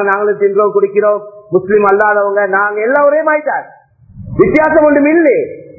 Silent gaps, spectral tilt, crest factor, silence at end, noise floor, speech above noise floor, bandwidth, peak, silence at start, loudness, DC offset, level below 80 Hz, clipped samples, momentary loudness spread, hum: none; -10 dB/octave; 12 dB; 0.15 s; -34 dBFS; 23 dB; 2.9 kHz; 0 dBFS; 0 s; -11 LUFS; under 0.1%; -44 dBFS; under 0.1%; 8 LU; none